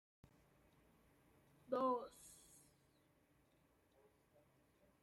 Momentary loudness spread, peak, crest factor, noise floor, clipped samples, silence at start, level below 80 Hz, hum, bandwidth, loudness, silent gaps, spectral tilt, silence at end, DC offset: 21 LU; -30 dBFS; 22 dB; -77 dBFS; under 0.1%; 1.7 s; -84 dBFS; none; 15.5 kHz; -43 LUFS; none; -5 dB/octave; 2.65 s; under 0.1%